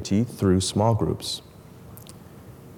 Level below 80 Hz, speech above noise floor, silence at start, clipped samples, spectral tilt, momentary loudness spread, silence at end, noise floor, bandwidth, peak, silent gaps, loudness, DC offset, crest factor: -50 dBFS; 22 dB; 0 s; under 0.1%; -6 dB/octave; 24 LU; 0 s; -45 dBFS; 17.5 kHz; -8 dBFS; none; -24 LUFS; under 0.1%; 16 dB